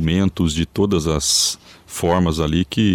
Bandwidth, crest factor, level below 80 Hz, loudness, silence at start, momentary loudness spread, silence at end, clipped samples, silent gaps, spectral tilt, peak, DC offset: 17 kHz; 12 dB; -34 dBFS; -18 LUFS; 0 s; 6 LU; 0 s; under 0.1%; none; -4.5 dB/octave; -6 dBFS; under 0.1%